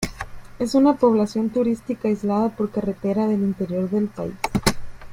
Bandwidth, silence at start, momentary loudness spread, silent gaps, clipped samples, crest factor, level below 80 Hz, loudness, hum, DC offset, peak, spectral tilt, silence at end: 16.5 kHz; 0 s; 10 LU; none; under 0.1%; 20 dB; -44 dBFS; -22 LUFS; none; under 0.1%; -2 dBFS; -6 dB/octave; 0 s